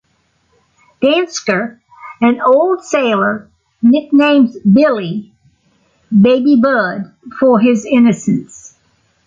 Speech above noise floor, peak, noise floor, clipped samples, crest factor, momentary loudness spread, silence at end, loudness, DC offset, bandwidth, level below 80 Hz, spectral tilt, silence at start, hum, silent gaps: 48 dB; 0 dBFS; -60 dBFS; under 0.1%; 12 dB; 9 LU; 0.85 s; -12 LUFS; under 0.1%; 7.6 kHz; -56 dBFS; -6 dB/octave; 1 s; none; none